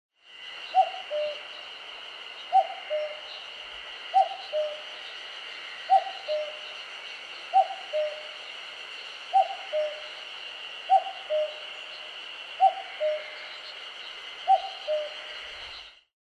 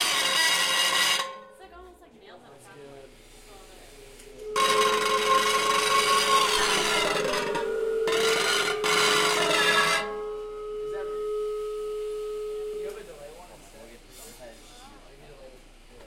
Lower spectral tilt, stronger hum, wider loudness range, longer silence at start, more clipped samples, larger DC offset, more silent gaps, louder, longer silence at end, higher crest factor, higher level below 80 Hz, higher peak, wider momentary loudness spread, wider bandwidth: about the same, 0 dB/octave vs -0.5 dB/octave; neither; second, 2 LU vs 14 LU; first, 0.25 s vs 0 s; neither; neither; neither; second, -30 LUFS vs -24 LUFS; first, 0.25 s vs 0 s; about the same, 20 dB vs 18 dB; second, -74 dBFS vs -54 dBFS; about the same, -12 dBFS vs -10 dBFS; about the same, 14 LU vs 16 LU; second, 9.8 kHz vs 16.5 kHz